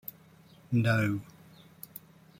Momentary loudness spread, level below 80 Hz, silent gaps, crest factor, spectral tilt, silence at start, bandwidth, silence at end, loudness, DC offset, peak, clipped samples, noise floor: 22 LU; -66 dBFS; none; 18 dB; -7 dB/octave; 0.7 s; 16.5 kHz; 0.4 s; -29 LUFS; under 0.1%; -16 dBFS; under 0.1%; -57 dBFS